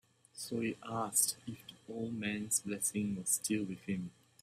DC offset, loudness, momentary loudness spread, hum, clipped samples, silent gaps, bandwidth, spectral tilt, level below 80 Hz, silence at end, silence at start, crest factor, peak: under 0.1%; -36 LUFS; 16 LU; none; under 0.1%; none; 16 kHz; -3 dB/octave; -74 dBFS; 0.3 s; 0.35 s; 22 dB; -16 dBFS